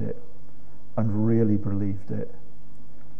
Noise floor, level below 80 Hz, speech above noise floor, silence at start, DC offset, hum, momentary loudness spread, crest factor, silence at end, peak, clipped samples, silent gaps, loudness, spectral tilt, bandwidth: -51 dBFS; -56 dBFS; 27 dB; 0 s; 7%; none; 14 LU; 18 dB; 0.85 s; -8 dBFS; under 0.1%; none; -26 LUFS; -11.5 dB/octave; 2.8 kHz